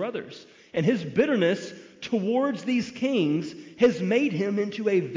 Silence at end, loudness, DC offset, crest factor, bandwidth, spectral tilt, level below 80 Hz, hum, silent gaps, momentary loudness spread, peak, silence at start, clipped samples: 0 s; -25 LUFS; under 0.1%; 16 dB; 7.6 kHz; -6.5 dB/octave; -68 dBFS; none; none; 14 LU; -10 dBFS; 0 s; under 0.1%